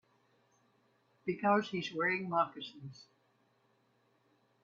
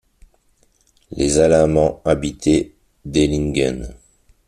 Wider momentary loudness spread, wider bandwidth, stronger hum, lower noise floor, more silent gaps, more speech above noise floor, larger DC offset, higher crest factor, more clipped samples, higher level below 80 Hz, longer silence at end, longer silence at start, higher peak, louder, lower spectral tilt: second, 16 LU vs 19 LU; second, 7.4 kHz vs 13 kHz; neither; first, -74 dBFS vs -59 dBFS; neither; about the same, 39 dB vs 42 dB; neither; first, 24 dB vs 18 dB; neither; second, -82 dBFS vs -36 dBFS; first, 1.6 s vs 0.55 s; first, 1.25 s vs 1.1 s; second, -16 dBFS vs -2 dBFS; second, -34 LUFS vs -17 LUFS; about the same, -6 dB/octave vs -5.5 dB/octave